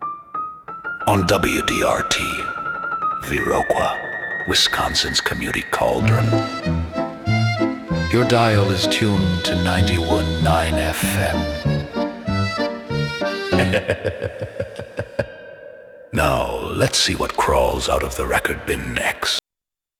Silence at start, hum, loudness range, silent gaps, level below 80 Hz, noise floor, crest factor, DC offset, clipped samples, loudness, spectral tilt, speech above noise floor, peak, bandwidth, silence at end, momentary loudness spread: 0 s; none; 5 LU; none; -36 dBFS; -87 dBFS; 16 dB; under 0.1%; under 0.1%; -20 LUFS; -4.5 dB/octave; 68 dB; -4 dBFS; 19.5 kHz; 0.6 s; 11 LU